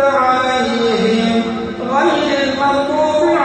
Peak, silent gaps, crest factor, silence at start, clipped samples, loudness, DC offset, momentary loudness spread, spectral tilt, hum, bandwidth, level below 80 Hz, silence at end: -2 dBFS; none; 12 dB; 0 s; under 0.1%; -15 LUFS; under 0.1%; 4 LU; -5 dB/octave; none; 8.8 kHz; -48 dBFS; 0 s